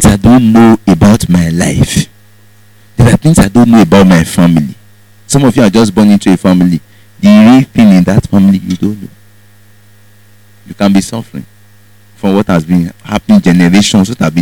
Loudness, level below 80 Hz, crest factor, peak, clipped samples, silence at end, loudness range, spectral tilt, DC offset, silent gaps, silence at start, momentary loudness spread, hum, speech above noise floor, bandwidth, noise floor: -7 LUFS; -28 dBFS; 8 dB; 0 dBFS; 3%; 0 s; 8 LU; -6 dB/octave; 0.8%; none; 0 s; 12 LU; none; 36 dB; 17.5 kHz; -43 dBFS